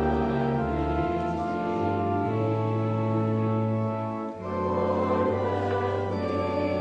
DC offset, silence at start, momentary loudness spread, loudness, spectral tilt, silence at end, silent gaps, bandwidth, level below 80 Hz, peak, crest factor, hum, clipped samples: under 0.1%; 0 s; 3 LU; -27 LUFS; -9 dB/octave; 0 s; none; 7.6 kHz; -44 dBFS; -14 dBFS; 12 dB; none; under 0.1%